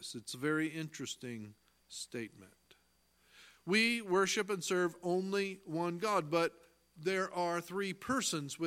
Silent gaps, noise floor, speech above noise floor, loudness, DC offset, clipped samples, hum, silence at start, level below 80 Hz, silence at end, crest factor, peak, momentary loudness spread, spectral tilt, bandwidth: none; -73 dBFS; 37 dB; -35 LUFS; under 0.1%; under 0.1%; none; 0 s; -76 dBFS; 0 s; 20 dB; -18 dBFS; 14 LU; -4 dB/octave; 16.5 kHz